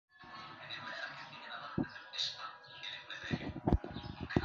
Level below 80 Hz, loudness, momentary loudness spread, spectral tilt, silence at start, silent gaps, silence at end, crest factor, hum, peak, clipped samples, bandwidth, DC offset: -48 dBFS; -41 LUFS; 12 LU; -4 dB/octave; 0.15 s; none; 0 s; 26 dB; none; -14 dBFS; under 0.1%; 7.4 kHz; under 0.1%